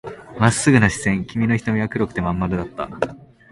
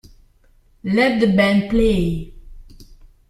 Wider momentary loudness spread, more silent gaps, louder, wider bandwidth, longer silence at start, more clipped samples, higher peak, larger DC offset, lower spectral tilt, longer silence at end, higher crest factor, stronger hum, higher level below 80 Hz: second, 12 LU vs 15 LU; neither; second, -20 LUFS vs -17 LUFS; second, 11.5 kHz vs 13 kHz; second, 0.05 s vs 0.85 s; neither; about the same, 0 dBFS vs -2 dBFS; neither; second, -5.5 dB/octave vs -7 dB/octave; about the same, 0.35 s vs 0.25 s; about the same, 20 dB vs 18 dB; neither; second, -42 dBFS vs -34 dBFS